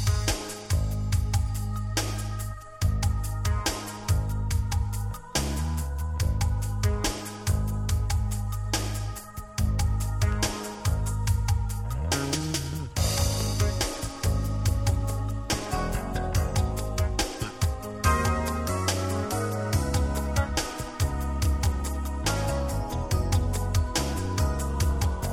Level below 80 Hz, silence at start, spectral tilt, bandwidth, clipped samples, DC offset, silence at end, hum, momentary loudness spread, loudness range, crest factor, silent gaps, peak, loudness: -30 dBFS; 0 s; -4.5 dB/octave; 17 kHz; under 0.1%; under 0.1%; 0 s; none; 5 LU; 2 LU; 16 dB; none; -10 dBFS; -28 LUFS